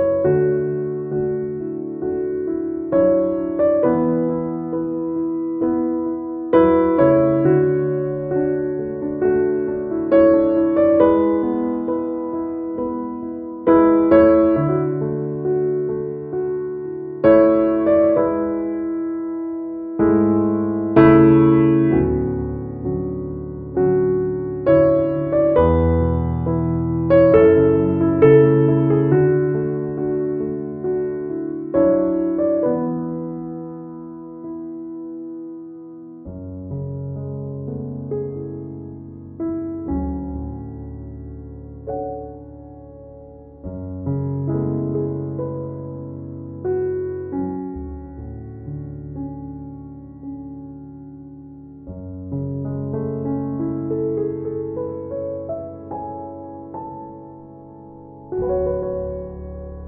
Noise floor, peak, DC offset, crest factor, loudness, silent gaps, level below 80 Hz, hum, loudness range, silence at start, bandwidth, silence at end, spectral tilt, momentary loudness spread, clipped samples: -40 dBFS; -2 dBFS; under 0.1%; 18 dB; -19 LUFS; none; -40 dBFS; none; 16 LU; 0 s; 3.7 kHz; 0 s; -9.5 dB/octave; 20 LU; under 0.1%